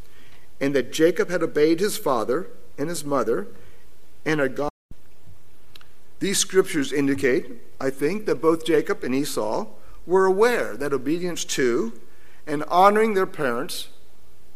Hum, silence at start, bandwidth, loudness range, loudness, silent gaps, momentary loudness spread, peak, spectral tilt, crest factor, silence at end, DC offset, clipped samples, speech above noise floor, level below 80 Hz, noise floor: none; 0.6 s; 16 kHz; 6 LU; -23 LUFS; 4.70-4.89 s; 11 LU; -4 dBFS; -4 dB/octave; 22 dB; 0.7 s; 3%; under 0.1%; 34 dB; -56 dBFS; -56 dBFS